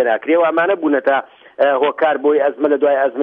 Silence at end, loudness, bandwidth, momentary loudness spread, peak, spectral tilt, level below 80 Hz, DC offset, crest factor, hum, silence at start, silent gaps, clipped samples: 0 s; -15 LUFS; 4.2 kHz; 3 LU; -2 dBFS; -7.5 dB/octave; -72 dBFS; under 0.1%; 12 dB; none; 0 s; none; under 0.1%